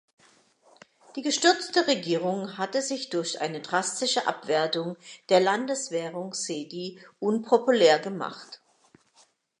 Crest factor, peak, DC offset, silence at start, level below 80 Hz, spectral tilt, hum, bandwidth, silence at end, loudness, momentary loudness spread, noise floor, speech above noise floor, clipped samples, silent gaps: 22 dB; -6 dBFS; under 0.1%; 1.15 s; -84 dBFS; -3 dB/octave; none; 11 kHz; 1.05 s; -26 LUFS; 15 LU; -63 dBFS; 37 dB; under 0.1%; none